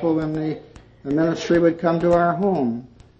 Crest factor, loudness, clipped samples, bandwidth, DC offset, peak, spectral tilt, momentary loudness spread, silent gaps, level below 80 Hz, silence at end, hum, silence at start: 16 dB; -20 LUFS; under 0.1%; 7.6 kHz; under 0.1%; -6 dBFS; -7.5 dB/octave; 13 LU; none; -48 dBFS; 0.35 s; none; 0 s